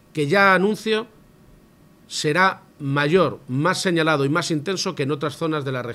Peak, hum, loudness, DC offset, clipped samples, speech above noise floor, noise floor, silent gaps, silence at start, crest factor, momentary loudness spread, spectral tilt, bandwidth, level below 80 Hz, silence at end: -2 dBFS; none; -21 LUFS; under 0.1%; under 0.1%; 31 dB; -52 dBFS; none; 0.15 s; 20 dB; 9 LU; -5 dB/octave; 15 kHz; -60 dBFS; 0 s